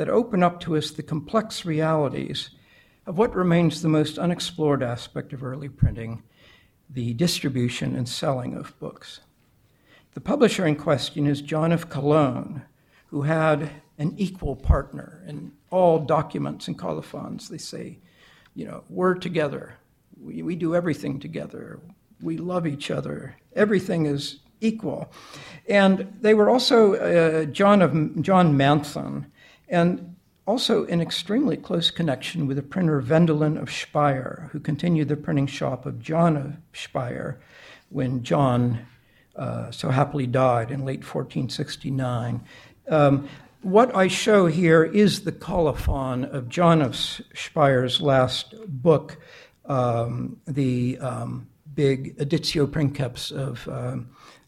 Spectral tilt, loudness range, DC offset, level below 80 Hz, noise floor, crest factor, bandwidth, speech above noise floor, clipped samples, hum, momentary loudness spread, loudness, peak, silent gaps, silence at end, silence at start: -6.5 dB/octave; 8 LU; under 0.1%; -42 dBFS; -61 dBFS; 20 dB; 14 kHz; 39 dB; under 0.1%; none; 17 LU; -23 LUFS; -4 dBFS; none; 0.4 s; 0 s